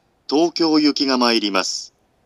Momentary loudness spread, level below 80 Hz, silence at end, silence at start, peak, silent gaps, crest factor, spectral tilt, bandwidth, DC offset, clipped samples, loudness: 7 LU; -72 dBFS; 0.4 s; 0.3 s; -2 dBFS; none; 18 dB; -3 dB/octave; 12 kHz; under 0.1%; under 0.1%; -18 LUFS